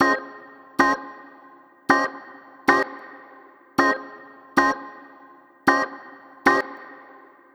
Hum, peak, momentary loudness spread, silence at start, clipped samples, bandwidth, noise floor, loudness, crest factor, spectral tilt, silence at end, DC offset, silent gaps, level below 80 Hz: none; -2 dBFS; 23 LU; 0 s; under 0.1%; 18 kHz; -50 dBFS; -22 LUFS; 24 dB; -4 dB/octave; 0.6 s; under 0.1%; none; -62 dBFS